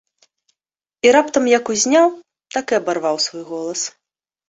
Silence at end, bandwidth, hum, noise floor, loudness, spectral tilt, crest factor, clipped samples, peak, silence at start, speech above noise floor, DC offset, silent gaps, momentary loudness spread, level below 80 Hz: 0.6 s; 8.2 kHz; none; -86 dBFS; -17 LUFS; -2 dB/octave; 18 dB; under 0.1%; -2 dBFS; 1.05 s; 69 dB; under 0.1%; none; 12 LU; -64 dBFS